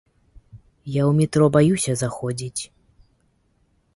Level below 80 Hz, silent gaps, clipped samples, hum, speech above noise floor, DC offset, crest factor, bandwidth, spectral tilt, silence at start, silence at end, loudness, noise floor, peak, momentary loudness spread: -52 dBFS; none; under 0.1%; none; 45 dB; under 0.1%; 18 dB; 11.5 kHz; -6 dB/octave; 0.55 s; 1.3 s; -21 LUFS; -64 dBFS; -4 dBFS; 15 LU